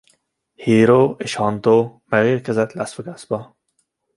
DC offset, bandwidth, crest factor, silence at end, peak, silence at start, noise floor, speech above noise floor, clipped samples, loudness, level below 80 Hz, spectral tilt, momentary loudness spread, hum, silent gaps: under 0.1%; 11.5 kHz; 16 dB; 0.75 s; -2 dBFS; 0.6 s; -69 dBFS; 52 dB; under 0.1%; -18 LUFS; -58 dBFS; -6.5 dB/octave; 14 LU; none; none